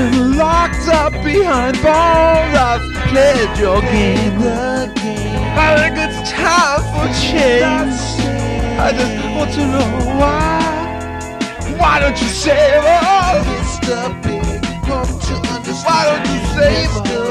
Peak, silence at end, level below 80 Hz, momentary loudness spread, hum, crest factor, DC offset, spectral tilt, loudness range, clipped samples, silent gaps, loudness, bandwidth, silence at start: 0 dBFS; 0 s; -24 dBFS; 9 LU; none; 14 dB; under 0.1%; -5 dB/octave; 4 LU; under 0.1%; none; -14 LUFS; 14 kHz; 0 s